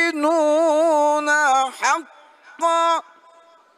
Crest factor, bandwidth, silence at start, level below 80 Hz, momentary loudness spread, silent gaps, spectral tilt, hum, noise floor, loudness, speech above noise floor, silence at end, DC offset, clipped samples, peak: 14 dB; 13.5 kHz; 0 s; -84 dBFS; 6 LU; none; 0 dB/octave; none; -51 dBFS; -18 LUFS; 33 dB; 0.75 s; under 0.1%; under 0.1%; -6 dBFS